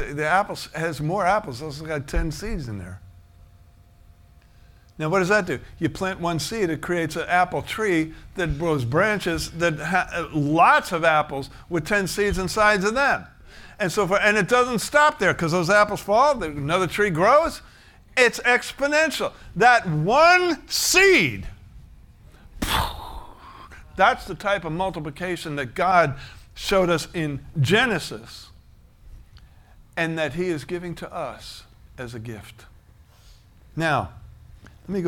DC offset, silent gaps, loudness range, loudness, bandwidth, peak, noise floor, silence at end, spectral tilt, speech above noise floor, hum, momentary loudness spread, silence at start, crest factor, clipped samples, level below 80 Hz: under 0.1%; none; 12 LU; -21 LUFS; 18.5 kHz; -2 dBFS; -51 dBFS; 0 s; -4.5 dB/octave; 30 dB; none; 17 LU; 0 s; 20 dB; under 0.1%; -42 dBFS